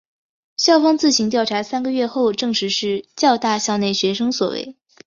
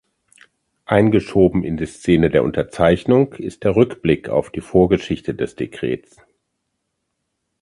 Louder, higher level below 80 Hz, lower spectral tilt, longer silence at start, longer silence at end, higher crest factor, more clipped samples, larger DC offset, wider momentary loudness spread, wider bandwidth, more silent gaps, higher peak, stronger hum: about the same, -18 LUFS vs -18 LUFS; second, -62 dBFS vs -42 dBFS; second, -3.5 dB/octave vs -7.5 dB/octave; second, 0.6 s vs 0.9 s; second, 0.35 s vs 1.65 s; about the same, 16 dB vs 18 dB; neither; neither; about the same, 8 LU vs 10 LU; second, 7.6 kHz vs 11.5 kHz; neither; about the same, -2 dBFS vs 0 dBFS; neither